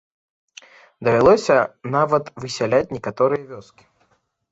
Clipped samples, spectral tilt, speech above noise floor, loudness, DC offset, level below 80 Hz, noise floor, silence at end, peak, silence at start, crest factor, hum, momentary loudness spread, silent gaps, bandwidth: under 0.1%; -6 dB/octave; 46 dB; -19 LUFS; under 0.1%; -52 dBFS; -64 dBFS; 0.9 s; -2 dBFS; 1 s; 18 dB; none; 14 LU; none; 8 kHz